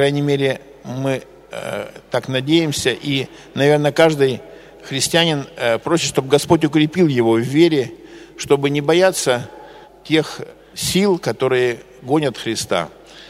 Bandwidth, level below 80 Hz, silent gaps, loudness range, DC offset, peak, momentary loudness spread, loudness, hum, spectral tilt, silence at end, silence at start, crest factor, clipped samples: 16 kHz; -52 dBFS; none; 4 LU; under 0.1%; 0 dBFS; 14 LU; -17 LUFS; none; -4.5 dB/octave; 0 s; 0 s; 18 dB; under 0.1%